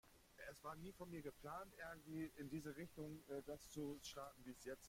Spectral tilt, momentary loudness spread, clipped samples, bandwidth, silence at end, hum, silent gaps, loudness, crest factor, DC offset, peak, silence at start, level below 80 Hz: -5 dB/octave; 5 LU; under 0.1%; 16.5 kHz; 0 s; none; none; -54 LUFS; 16 dB; under 0.1%; -38 dBFS; 0.05 s; -72 dBFS